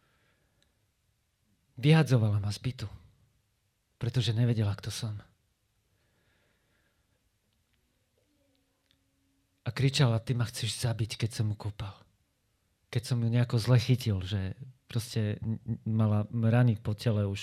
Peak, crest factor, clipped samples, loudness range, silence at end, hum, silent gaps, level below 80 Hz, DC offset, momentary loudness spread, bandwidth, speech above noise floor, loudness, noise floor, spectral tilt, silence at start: -12 dBFS; 18 dB; under 0.1%; 5 LU; 0 s; none; none; -60 dBFS; under 0.1%; 13 LU; 13.5 kHz; 47 dB; -30 LUFS; -75 dBFS; -6.5 dB/octave; 1.75 s